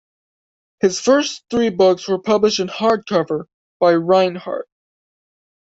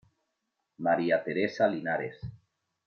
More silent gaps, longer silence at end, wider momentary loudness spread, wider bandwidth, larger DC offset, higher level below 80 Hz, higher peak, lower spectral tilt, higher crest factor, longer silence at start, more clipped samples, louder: first, 3.54-3.80 s vs none; first, 1.1 s vs 0.5 s; second, 10 LU vs 14 LU; first, 8 kHz vs 6.8 kHz; neither; first, -58 dBFS vs -64 dBFS; first, -2 dBFS vs -12 dBFS; second, -4.5 dB/octave vs -7 dB/octave; about the same, 16 dB vs 18 dB; about the same, 0.85 s vs 0.8 s; neither; first, -17 LUFS vs -29 LUFS